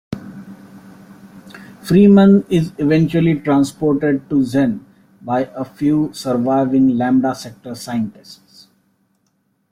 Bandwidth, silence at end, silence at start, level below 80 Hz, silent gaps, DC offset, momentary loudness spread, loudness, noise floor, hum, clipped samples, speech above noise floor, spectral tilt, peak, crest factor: 15 kHz; 1.4 s; 0.1 s; -52 dBFS; none; under 0.1%; 20 LU; -16 LUFS; -65 dBFS; none; under 0.1%; 50 dB; -7.5 dB/octave; -2 dBFS; 14 dB